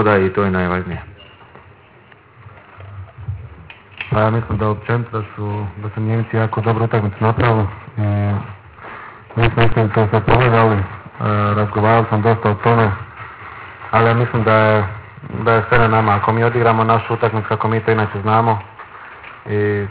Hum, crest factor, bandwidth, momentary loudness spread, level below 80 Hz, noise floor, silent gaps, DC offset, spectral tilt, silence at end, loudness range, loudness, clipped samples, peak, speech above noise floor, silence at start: none; 16 dB; 4 kHz; 19 LU; -38 dBFS; -46 dBFS; none; under 0.1%; -11 dB/octave; 0 s; 8 LU; -16 LUFS; under 0.1%; 0 dBFS; 30 dB; 0 s